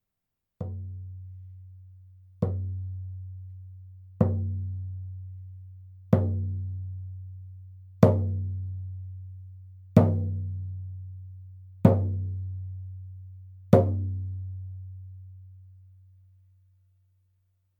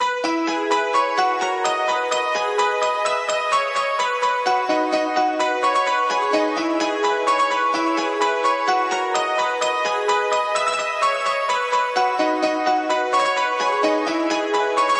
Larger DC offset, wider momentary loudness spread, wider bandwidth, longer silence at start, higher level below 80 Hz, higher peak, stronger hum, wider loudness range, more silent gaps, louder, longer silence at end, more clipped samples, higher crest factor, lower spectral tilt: neither; first, 25 LU vs 2 LU; second, 4.7 kHz vs 11.5 kHz; first, 0.6 s vs 0 s; first, -58 dBFS vs -88 dBFS; first, -2 dBFS vs -6 dBFS; neither; first, 10 LU vs 1 LU; neither; second, -28 LUFS vs -20 LUFS; first, 1.95 s vs 0 s; neither; first, 28 dB vs 14 dB; first, -10.5 dB/octave vs -1.5 dB/octave